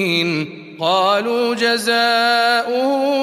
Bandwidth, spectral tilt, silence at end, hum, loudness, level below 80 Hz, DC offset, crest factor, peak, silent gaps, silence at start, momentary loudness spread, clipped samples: 15.5 kHz; -4 dB/octave; 0 s; none; -16 LUFS; -70 dBFS; under 0.1%; 14 dB; -4 dBFS; none; 0 s; 7 LU; under 0.1%